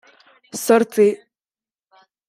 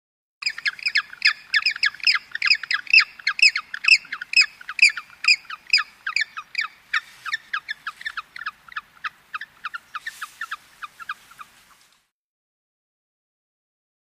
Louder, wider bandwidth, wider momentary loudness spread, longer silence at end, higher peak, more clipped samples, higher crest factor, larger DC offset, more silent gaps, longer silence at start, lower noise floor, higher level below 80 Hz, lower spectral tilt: about the same, -17 LUFS vs -19 LUFS; about the same, 16 kHz vs 15.5 kHz; about the same, 18 LU vs 19 LU; second, 1.15 s vs 2.65 s; about the same, -2 dBFS vs -2 dBFS; neither; about the same, 20 dB vs 22 dB; neither; neither; about the same, 0.55 s vs 0.45 s; first, under -90 dBFS vs -62 dBFS; about the same, -74 dBFS vs -72 dBFS; first, -4.5 dB/octave vs 4 dB/octave